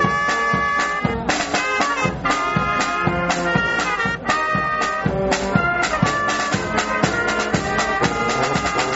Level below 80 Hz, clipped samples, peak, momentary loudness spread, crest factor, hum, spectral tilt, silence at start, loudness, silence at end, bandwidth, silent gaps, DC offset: -40 dBFS; under 0.1%; -2 dBFS; 2 LU; 18 dB; none; -4 dB/octave; 0 s; -19 LUFS; 0 s; 8.2 kHz; none; under 0.1%